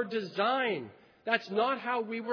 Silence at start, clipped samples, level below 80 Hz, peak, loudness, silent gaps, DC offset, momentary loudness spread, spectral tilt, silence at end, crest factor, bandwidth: 0 s; under 0.1%; -86 dBFS; -12 dBFS; -31 LUFS; none; under 0.1%; 10 LU; -5.5 dB/octave; 0 s; 20 dB; 5.4 kHz